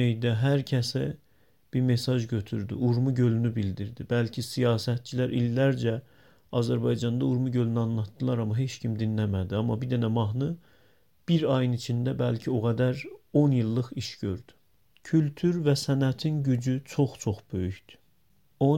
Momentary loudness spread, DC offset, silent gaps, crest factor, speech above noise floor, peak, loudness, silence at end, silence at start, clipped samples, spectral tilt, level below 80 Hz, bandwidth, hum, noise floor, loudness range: 8 LU; under 0.1%; none; 16 dB; 42 dB; -10 dBFS; -28 LUFS; 0 s; 0 s; under 0.1%; -7 dB/octave; -58 dBFS; 16 kHz; none; -68 dBFS; 2 LU